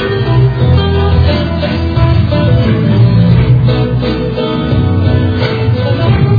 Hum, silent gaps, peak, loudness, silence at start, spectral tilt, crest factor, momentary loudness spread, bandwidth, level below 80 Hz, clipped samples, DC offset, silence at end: none; none; 0 dBFS; -11 LUFS; 0 s; -9.5 dB/octave; 10 dB; 5 LU; 5 kHz; -22 dBFS; under 0.1%; under 0.1%; 0 s